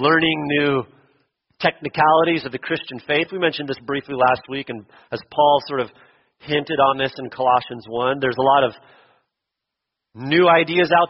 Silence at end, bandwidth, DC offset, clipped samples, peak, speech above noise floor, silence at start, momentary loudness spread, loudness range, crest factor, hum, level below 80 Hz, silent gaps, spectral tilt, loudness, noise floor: 0 s; 6 kHz; under 0.1%; under 0.1%; -2 dBFS; 63 dB; 0 s; 13 LU; 2 LU; 18 dB; none; -60 dBFS; none; -2.5 dB/octave; -19 LUFS; -82 dBFS